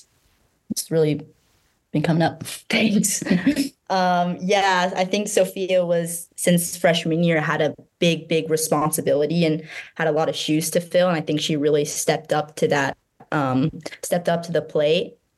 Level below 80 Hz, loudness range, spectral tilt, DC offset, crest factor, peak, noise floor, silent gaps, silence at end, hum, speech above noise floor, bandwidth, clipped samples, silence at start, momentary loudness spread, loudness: -60 dBFS; 2 LU; -4.5 dB/octave; under 0.1%; 18 dB; -4 dBFS; -64 dBFS; none; 0.3 s; none; 43 dB; 13 kHz; under 0.1%; 0.7 s; 6 LU; -21 LUFS